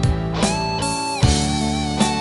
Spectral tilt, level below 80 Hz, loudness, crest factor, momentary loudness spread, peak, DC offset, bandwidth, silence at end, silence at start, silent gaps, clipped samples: -4.5 dB/octave; -28 dBFS; -20 LUFS; 16 dB; 4 LU; -2 dBFS; under 0.1%; 11.5 kHz; 0 s; 0 s; none; under 0.1%